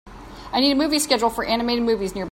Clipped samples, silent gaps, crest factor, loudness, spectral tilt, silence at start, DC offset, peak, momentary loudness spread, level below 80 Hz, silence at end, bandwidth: under 0.1%; none; 18 dB; -21 LUFS; -3 dB/octave; 0.05 s; under 0.1%; -4 dBFS; 6 LU; -46 dBFS; 0 s; 16.5 kHz